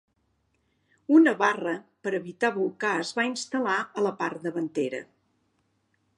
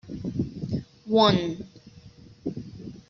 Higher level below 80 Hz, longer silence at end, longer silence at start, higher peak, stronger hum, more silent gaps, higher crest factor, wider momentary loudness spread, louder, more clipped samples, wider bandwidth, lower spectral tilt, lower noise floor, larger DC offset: second, -80 dBFS vs -54 dBFS; first, 1.15 s vs 0.1 s; first, 1.1 s vs 0.05 s; about the same, -6 dBFS vs -6 dBFS; neither; neither; about the same, 22 dB vs 20 dB; second, 12 LU vs 19 LU; about the same, -26 LUFS vs -26 LUFS; neither; first, 10.5 kHz vs 7 kHz; about the same, -4.5 dB/octave vs -5 dB/octave; first, -72 dBFS vs -49 dBFS; neither